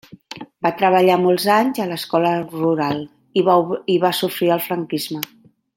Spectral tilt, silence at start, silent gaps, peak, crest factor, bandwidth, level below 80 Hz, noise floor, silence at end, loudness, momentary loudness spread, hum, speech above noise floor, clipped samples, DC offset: -5.5 dB/octave; 0.3 s; none; 0 dBFS; 18 dB; 17 kHz; -66 dBFS; -37 dBFS; 0.5 s; -18 LUFS; 12 LU; none; 20 dB; under 0.1%; under 0.1%